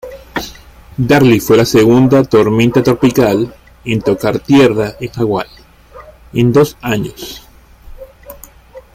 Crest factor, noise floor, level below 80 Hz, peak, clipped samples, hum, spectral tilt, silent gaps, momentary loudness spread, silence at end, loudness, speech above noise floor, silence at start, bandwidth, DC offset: 12 dB; -38 dBFS; -40 dBFS; 0 dBFS; under 0.1%; none; -6.5 dB/octave; none; 16 LU; 0.15 s; -12 LUFS; 27 dB; 0.05 s; 16 kHz; under 0.1%